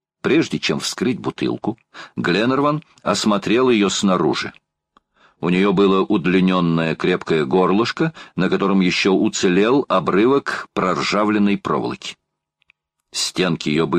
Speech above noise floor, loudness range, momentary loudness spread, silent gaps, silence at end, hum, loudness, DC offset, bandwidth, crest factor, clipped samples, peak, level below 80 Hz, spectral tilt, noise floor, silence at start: 52 dB; 3 LU; 8 LU; none; 0 s; none; -18 LUFS; under 0.1%; 13.5 kHz; 14 dB; under 0.1%; -4 dBFS; -54 dBFS; -5 dB/octave; -70 dBFS; 0.25 s